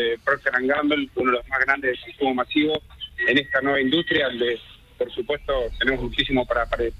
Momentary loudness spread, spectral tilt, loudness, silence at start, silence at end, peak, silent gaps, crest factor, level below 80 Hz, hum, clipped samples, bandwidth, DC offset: 7 LU; -6 dB/octave; -22 LUFS; 0 s; 0.05 s; -4 dBFS; none; 18 dB; -42 dBFS; none; under 0.1%; 13 kHz; under 0.1%